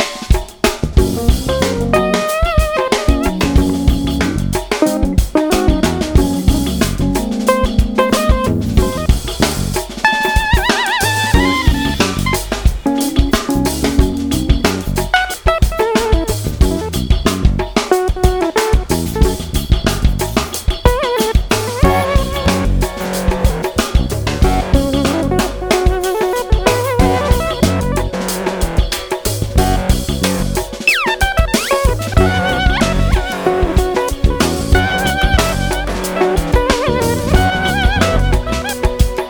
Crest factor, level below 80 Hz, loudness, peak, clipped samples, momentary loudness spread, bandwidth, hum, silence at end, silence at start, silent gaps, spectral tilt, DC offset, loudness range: 14 dB; -18 dBFS; -15 LUFS; 0 dBFS; under 0.1%; 4 LU; over 20 kHz; none; 0 s; 0 s; none; -5 dB/octave; under 0.1%; 2 LU